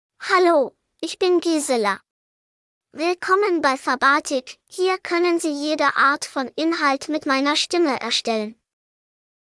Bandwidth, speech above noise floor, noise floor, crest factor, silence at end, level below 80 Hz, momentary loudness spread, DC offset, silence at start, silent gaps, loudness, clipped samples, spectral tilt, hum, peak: 12 kHz; over 70 dB; under -90 dBFS; 18 dB; 0.9 s; -72 dBFS; 9 LU; under 0.1%; 0.2 s; 2.11-2.81 s; -20 LUFS; under 0.1%; -2 dB/octave; none; -4 dBFS